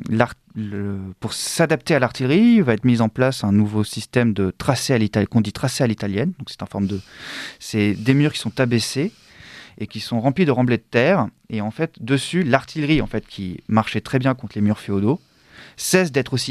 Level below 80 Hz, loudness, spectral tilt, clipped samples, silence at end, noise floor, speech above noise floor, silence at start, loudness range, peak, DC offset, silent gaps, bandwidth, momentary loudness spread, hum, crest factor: -48 dBFS; -20 LUFS; -5.5 dB/octave; under 0.1%; 0 s; -46 dBFS; 26 dB; 0 s; 4 LU; 0 dBFS; under 0.1%; none; 13.5 kHz; 12 LU; none; 20 dB